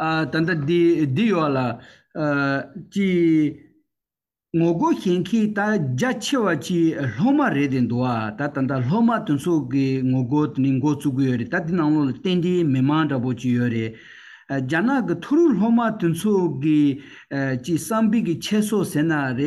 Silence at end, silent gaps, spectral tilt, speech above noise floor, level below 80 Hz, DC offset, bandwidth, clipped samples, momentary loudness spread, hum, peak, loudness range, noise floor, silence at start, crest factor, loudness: 0 s; none; -6.5 dB/octave; over 70 dB; -60 dBFS; under 0.1%; 12.5 kHz; under 0.1%; 6 LU; none; -10 dBFS; 2 LU; under -90 dBFS; 0 s; 12 dB; -21 LUFS